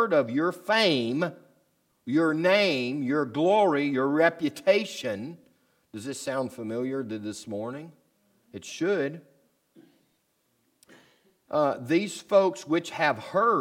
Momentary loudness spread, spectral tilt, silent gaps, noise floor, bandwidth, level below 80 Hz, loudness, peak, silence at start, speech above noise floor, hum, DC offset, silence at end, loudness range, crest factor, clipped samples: 15 LU; -5 dB/octave; none; -72 dBFS; 16 kHz; -80 dBFS; -26 LUFS; -8 dBFS; 0 s; 46 dB; none; under 0.1%; 0 s; 11 LU; 20 dB; under 0.1%